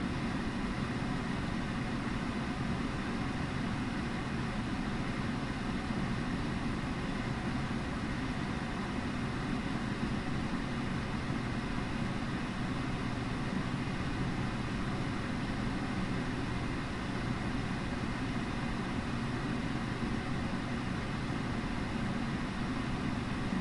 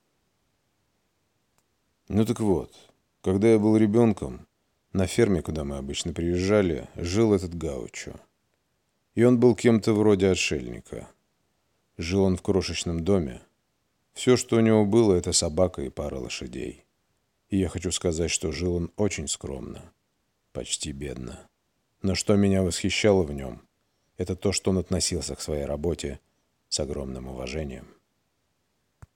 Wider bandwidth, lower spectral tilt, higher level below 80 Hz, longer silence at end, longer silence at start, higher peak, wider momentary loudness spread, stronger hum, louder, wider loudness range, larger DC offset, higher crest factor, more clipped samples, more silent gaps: second, 11.5 kHz vs 16.5 kHz; about the same, -6 dB/octave vs -5 dB/octave; about the same, -44 dBFS vs -46 dBFS; second, 0 s vs 1.3 s; second, 0 s vs 2.1 s; second, -20 dBFS vs -6 dBFS; second, 1 LU vs 17 LU; neither; second, -36 LUFS vs -25 LUFS; second, 0 LU vs 7 LU; neither; second, 14 dB vs 20 dB; neither; neither